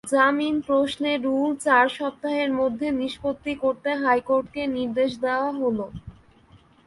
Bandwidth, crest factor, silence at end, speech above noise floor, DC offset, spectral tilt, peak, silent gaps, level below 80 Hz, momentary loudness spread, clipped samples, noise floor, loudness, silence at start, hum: 11.5 kHz; 18 dB; 0.3 s; 31 dB; under 0.1%; -4.5 dB/octave; -6 dBFS; none; -56 dBFS; 9 LU; under 0.1%; -54 dBFS; -24 LUFS; 0.05 s; none